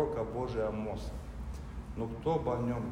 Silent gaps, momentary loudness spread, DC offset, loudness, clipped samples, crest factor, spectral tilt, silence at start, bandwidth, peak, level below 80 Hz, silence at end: none; 11 LU; under 0.1%; -36 LUFS; under 0.1%; 16 dB; -8 dB/octave; 0 s; 16 kHz; -20 dBFS; -44 dBFS; 0 s